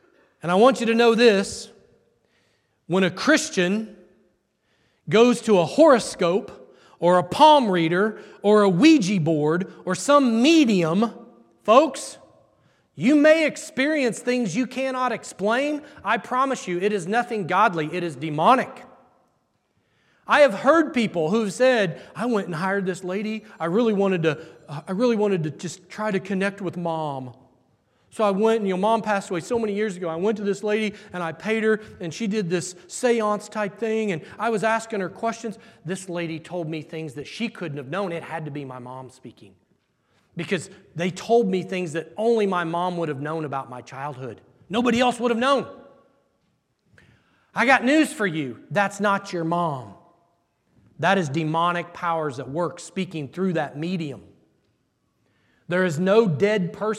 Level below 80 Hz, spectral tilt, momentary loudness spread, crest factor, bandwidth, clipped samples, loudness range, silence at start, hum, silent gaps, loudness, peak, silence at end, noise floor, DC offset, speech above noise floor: -68 dBFS; -5.5 dB/octave; 15 LU; 22 dB; 13.5 kHz; under 0.1%; 9 LU; 0.45 s; none; none; -22 LUFS; -2 dBFS; 0 s; -70 dBFS; under 0.1%; 48 dB